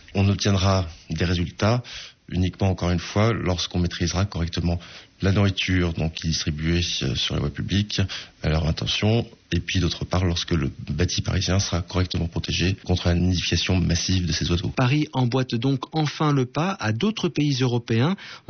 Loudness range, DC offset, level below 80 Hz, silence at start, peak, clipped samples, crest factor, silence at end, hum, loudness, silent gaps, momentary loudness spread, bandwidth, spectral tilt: 2 LU; under 0.1%; -42 dBFS; 0.1 s; -10 dBFS; under 0.1%; 14 dB; 0.1 s; none; -23 LUFS; none; 5 LU; 6.6 kHz; -5 dB/octave